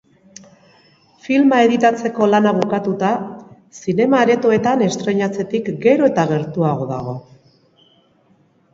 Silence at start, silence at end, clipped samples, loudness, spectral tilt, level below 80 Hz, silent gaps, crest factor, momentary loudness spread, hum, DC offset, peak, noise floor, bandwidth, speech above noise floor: 1.25 s; 1.55 s; under 0.1%; -16 LUFS; -6.5 dB/octave; -58 dBFS; none; 18 dB; 10 LU; none; under 0.1%; 0 dBFS; -56 dBFS; 7.8 kHz; 40 dB